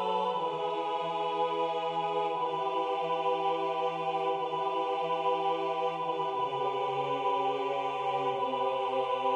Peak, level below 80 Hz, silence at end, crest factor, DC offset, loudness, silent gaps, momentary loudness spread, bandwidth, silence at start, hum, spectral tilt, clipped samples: -18 dBFS; -84 dBFS; 0 s; 14 dB; under 0.1%; -31 LUFS; none; 2 LU; 9.6 kHz; 0 s; none; -5.5 dB/octave; under 0.1%